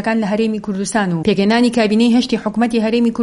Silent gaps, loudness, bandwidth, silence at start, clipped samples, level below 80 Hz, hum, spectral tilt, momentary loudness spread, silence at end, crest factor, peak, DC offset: none; -16 LUFS; 11.5 kHz; 0 s; under 0.1%; -48 dBFS; none; -5.5 dB/octave; 6 LU; 0 s; 14 dB; 0 dBFS; under 0.1%